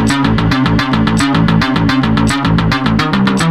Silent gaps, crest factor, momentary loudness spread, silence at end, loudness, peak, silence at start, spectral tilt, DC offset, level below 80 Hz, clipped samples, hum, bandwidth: none; 12 dB; 1 LU; 0 s; -12 LUFS; 0 dBFS; 0 s; -6 dB/octave; 0.9%; -26 dBFS; under 0.1%; none; 13 kHz